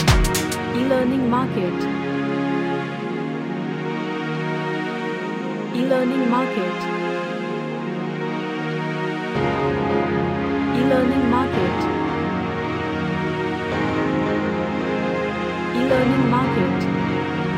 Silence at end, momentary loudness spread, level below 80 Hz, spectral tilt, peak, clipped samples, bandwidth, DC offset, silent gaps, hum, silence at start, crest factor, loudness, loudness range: 0 s; 8 LU; -36 dBFS; -6 dB/octave; -2 dBFS; under 0.1%; 16 kHz; under 0.1%; none; none; 0 s; 18 dB; -22 LUFS; 4 LU